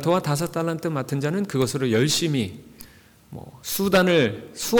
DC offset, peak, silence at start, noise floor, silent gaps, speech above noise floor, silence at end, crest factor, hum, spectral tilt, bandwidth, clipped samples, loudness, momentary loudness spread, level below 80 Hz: under 0.1%; -8 dBFS; 0 s; -50 dBFS; none; 28 dB; 0 s; 14 dB; none; -5 dB/octave; over 20 kHz; under 0.1%; -23 LUFS; 17 LU; -54 dBFS